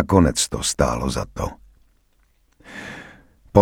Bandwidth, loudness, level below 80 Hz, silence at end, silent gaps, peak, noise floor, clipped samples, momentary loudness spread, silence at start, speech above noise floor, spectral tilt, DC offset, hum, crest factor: 18 kHz; -21 LUFS; -36 dBFS; 0 s; none; 0 dBFS; -61 dBFS; under 0.1%; 20 LU; 0 s; 41 dB; -5 dB/octave; under 0.1%; none; 22 dB